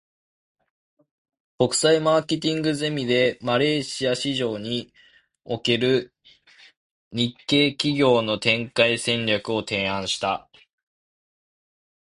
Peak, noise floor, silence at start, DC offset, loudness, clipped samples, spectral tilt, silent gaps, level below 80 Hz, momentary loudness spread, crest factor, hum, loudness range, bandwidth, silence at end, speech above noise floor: -4 dBFS; -54 dBFS; 1.6 s; under 0.1%; -22 LUFS; under 0.1%; -4 dB/octave; 6.77-7.11 s; -60 dBFS; 8 LU; 20 dB; none; 5 LU; 11.5 kHz; 1.7 s; 32 dB